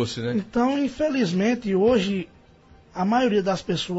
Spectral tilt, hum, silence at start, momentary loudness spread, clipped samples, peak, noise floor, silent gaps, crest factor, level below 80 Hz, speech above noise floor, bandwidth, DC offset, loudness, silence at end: -6 dB/octave; none; 0 s; 8 LU; under 0.1%; -8 dBFS; -52 dBFS; none; 14 dB; -52 dBFS; 30 dB; 8 kHz; under 0.1%; -23 LUFS; 0 s